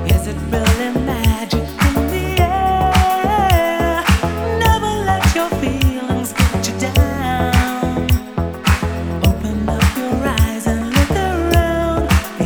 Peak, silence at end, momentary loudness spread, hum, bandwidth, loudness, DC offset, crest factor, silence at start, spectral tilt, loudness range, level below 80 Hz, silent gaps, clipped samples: 0 dBFS; 0 s; 5 LU; none; over 20 kHz; -17 LUFS; under 0.1%; 16 dB; 0 s; -5.5 dB/octave; 2 LU; -22 dBFS; none; under 0.1%